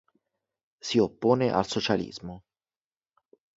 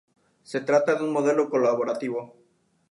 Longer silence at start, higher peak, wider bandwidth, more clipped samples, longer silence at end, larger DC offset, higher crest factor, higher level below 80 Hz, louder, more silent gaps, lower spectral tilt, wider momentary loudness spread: first, 0.85 s vs 0.5 s; about the same, -8 dBFS vs -8 dBFS; second, 8 kHz vs 11.5 kHz; neither; first, 1.2 s vs 0.65 s; neither; about the same, 22 dB vs 18 dB; first, -60 dBFS vs -80 dBFS; about the same, -26 LUFS vs -24 LUFS; neither; about the same, -5.5 dB/octave vs -6 dB/octave; first, 16 LU vs 10 LU